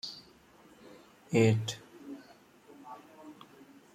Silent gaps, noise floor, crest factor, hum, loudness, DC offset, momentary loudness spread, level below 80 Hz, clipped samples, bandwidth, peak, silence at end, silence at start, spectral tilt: none; -59 dBFS; 24 dB; none; -30 LUFS; under 0.1%; 28 LU; -72 dBFS; under 0.1%; 15 kHz; -12 dBFS; 0.6 s; 0.05 s; -6 dB/octave